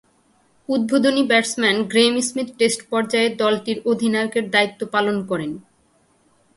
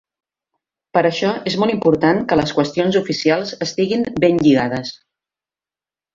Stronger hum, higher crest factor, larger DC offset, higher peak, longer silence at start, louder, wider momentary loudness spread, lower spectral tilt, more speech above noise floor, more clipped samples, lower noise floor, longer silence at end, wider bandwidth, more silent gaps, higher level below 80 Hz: neither; about the same, 18 dB vs 16 dB; neither; about the same, -2 dBFS vs -2 dBFS; second, 0.7 s vs 0.95 s; about the same, -19 LUFS vs -17 LUFS; about the same, 8 LU vs 6 LU; second, -3.5 dB/octave vs -6 dB/octave; second, 41 dB vs over 73 dB; neither; second, -60 dBFS vs under -90 dBFS; second, 0.95 s vs 1.2 s; first, 11.5 kHz vs 7.6 kHz; neither; second, -64 dBFS vs -52 dBFS